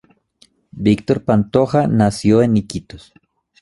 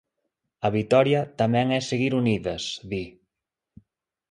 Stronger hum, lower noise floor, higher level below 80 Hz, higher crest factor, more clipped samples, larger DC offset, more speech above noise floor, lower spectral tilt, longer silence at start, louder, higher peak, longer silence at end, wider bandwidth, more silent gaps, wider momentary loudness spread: neither; second, -55 dBFS vs -86 dBFS; first, -44 dBFS vs -56 dBFS; about the same, 18 dB vs 20 dB; neither; neither; second, 40 dB vs 63 dB; first, -7.5 dB/octave vs -6 dB/octave; first, 0.75 s vs 0.6 s; first, -16 LUFS vs -24 LUFS; first, 0 dBFS vs -6 dBFS; second, 0.65 s vs 1.2 s; about the same, 11.5 kHz vs 10.5 kHz; neither; second, 6 LU vs 12 LU